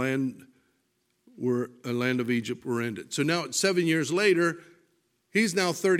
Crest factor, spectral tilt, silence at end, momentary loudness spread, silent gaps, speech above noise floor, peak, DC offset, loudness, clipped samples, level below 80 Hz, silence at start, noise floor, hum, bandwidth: 18 dB; -4.5 dB/octave; 0 s; 8 LU; none; 47 dB; -8 dBFS; under 0.1%; -27 LUFS; under 0.1%; -76 dBFS; 0 s; -74 dBFS; none; 16 kHz